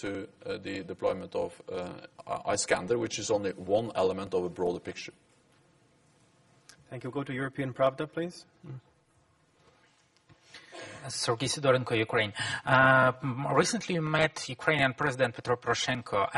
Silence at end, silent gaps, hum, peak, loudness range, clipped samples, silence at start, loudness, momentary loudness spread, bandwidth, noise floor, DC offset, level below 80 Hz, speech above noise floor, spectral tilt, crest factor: 0 s; none; none; -8 dBFS; 12 LU; under 0.1%; 0 s; -29 LUFS; 16 LU; 11.5 kHz; -67 dBFS; under 0.1%; -64 dBFS; 37 dB; -4 dB/octave; 22 dB